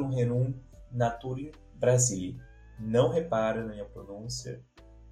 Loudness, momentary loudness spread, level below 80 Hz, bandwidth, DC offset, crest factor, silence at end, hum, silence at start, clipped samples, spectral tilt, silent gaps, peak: -30 LUFS; 18 LU; -52 dBFS; 13 kHz; under 0.1%; 20 dB; 0 s; none; 0 s; under 0.1%; -5.5 dB/octave; none; -10 dBFS